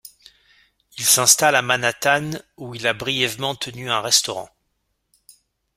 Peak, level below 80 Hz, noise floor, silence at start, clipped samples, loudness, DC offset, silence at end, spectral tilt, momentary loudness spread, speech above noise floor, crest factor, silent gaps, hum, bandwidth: 0 dBFS; -62 dBFS; -72 dBFS; 0.95 s; under 0.1%; -18 LUFS; under 0.1%; 1.3 s; -1 dB/octave; 18 LU; 52 dB; 22 dB; none; none; 16 kHz